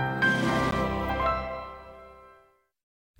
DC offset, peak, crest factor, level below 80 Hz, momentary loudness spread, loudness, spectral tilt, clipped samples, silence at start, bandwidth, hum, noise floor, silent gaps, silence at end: under 0.1%; -14 dBFS; 16 dB; -44 dBFS; 21 LU; -27 LUFS; -5.5 dB/octave; under 0.1%; 0 s; 16.5 kHz; none; -61 dBFS; none; 0.9 s